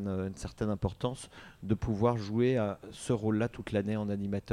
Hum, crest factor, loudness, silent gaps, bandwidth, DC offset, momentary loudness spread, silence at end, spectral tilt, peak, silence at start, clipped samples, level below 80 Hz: none; 18 dB; -33 LUFS; none; 12 kHz; under 0.1%; 10 LU; 0 s; -7 dB/octave; -14 dBFS; 0 s; under 0.1%; -52 dBFS